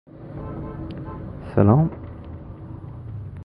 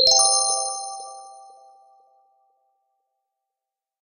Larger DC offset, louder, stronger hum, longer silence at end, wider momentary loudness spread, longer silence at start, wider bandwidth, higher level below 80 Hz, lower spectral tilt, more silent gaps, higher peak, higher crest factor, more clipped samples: neither; second, -23 LUFS vs -18 LUFS; neither; second, 0 s vs 2.65 s; second, 21 LU vs 25 LU; about the same, 0.1 s vs 0 s; second, 4.9 kHz vs 13 kHz; first, -42 dBFS vs -66 dBFS; first, -12 dB/octave vs 2 dB/octave; neither; about the same, -2 dBFS vs -4 dBFS; about the same, 22 dB vs 22 dB; neither